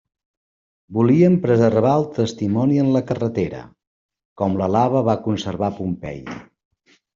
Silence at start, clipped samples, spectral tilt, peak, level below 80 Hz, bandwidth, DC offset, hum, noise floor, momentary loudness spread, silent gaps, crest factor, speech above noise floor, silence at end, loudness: 0.9 s; under 0.1%; -8 dB/octave; -2 dBFS; -54 dBFS; 7.6 kHz; under 0.1%; none; under -90 dBFS; 14 LU; 3.87-4.09 s, 4.25-4.36 s; 18 dB; over 72 dB; 0.75 s; -19 LUFS